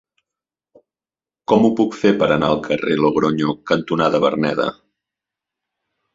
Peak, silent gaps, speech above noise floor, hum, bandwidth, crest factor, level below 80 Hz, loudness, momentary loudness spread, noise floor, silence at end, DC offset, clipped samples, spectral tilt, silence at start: -2 dBFS; none; over 73 dB; none; 7.8 kHz; 18 dB; -54 dBFS; -18 LUFS; 6 LU; under -90 dBFS; 1.45 s; under 0.1%; under 0.1%; -6.5 dB/octave; 1.5 s